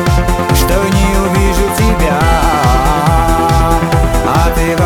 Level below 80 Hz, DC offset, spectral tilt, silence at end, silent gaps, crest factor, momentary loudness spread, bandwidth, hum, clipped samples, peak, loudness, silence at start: -14 dBFS; under 0.1%; -5.5 dB/octave; 0 s; none; 10 dB; 2 LU; 18.5 kHz; none; under 0.1%; 0 dBFS; -11 LUFS; 0 s